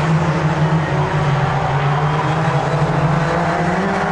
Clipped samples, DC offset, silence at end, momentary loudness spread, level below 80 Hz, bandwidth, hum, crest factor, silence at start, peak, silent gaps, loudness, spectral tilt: under 0.1%; under 0.1%; 0 s; 1 LU; -38 dBFS; 9.6 kHz; none; 12 dB; 0 s; -4 dBFS; none; -17 LUFS; -7 dB/octave